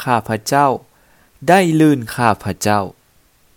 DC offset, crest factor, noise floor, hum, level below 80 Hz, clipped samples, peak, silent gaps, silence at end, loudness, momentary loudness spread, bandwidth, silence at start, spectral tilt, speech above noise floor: under 0.1%; 16 dB; -55 dBFS; none; -52 dBFS; under 0.1%; 0 dBFS; none; 0.65 s; -16 LUFS; 9 LU; 19 kHz; 0 s; -5.5 dB/octave; 40 dB